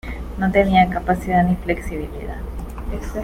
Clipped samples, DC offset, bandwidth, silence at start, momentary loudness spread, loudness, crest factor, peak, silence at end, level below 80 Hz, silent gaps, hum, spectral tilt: under 0.1%; under 0.1%; 15.5 kHz; 0.05 s; 16 LU; -20 LUFS; 18 dB; -2 dBFS; 0 s; -30 dBFS; none; none; -7 dB/octave